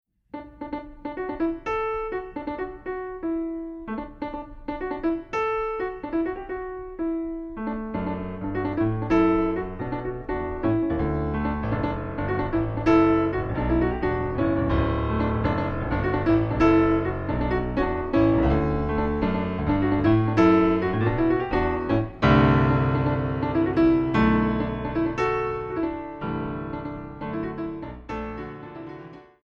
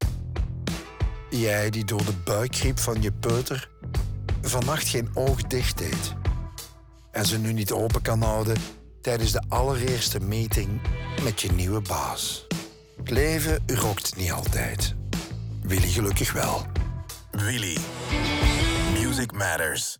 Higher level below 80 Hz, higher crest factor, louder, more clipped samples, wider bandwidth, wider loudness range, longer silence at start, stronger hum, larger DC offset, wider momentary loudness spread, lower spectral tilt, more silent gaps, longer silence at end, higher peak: about the same, -36 dBFS vs -34 dBFS; about the same, 18 dB vs 18 dB; about the same, -25 LUFS vs -26 LUFS; neither; second, 6.4 kHz vs over 20 kHz; first, 9 LU vs 1 LU; first, 0.35 s vs 0 s; neither; neither; first, 14 LU vs 8 LU; first, -9 dB/octave vs -4.5 dB/octave; neither; first, 0.25 s vs 0.05 s; about the same, -6 dBFS vs -8 dBFS